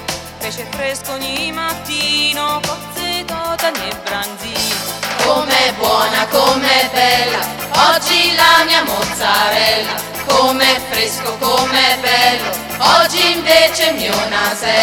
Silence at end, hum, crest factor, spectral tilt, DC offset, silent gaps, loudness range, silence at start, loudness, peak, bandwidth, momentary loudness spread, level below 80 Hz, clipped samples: 0 s; none; 14 dB; -1.5 dB/octave; under 0.1%; none; 6 LU; 0 s; -13 LUFS; 0 dBFS; 18 kHz; 11 LU; -44 dBFS; under 0.1%